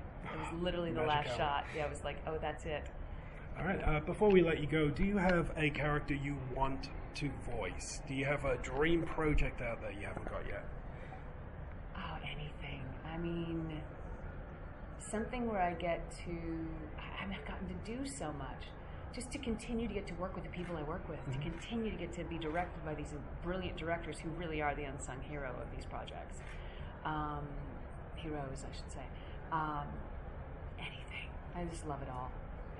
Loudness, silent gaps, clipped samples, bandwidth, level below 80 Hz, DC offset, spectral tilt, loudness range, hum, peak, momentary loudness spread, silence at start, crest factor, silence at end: -40 LUFS; none; under 0.1%; 11.5 kHz; -48 dBFS; under 0.1%; -6 dB/octave; 10 LU; none; -16 dBFS; 15 LU; 0 s; 22 dB; 0 s